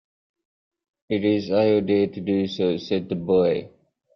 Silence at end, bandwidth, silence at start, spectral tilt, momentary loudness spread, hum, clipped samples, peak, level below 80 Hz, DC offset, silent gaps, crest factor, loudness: 0.5 s; 6.4 kHz; 1.1 s; -8 dB/octave; 6 LU; none; under 0.1%; -8 dBFS; -62 dBFS; under 0.1%; none; 16 dB; -22 LUFS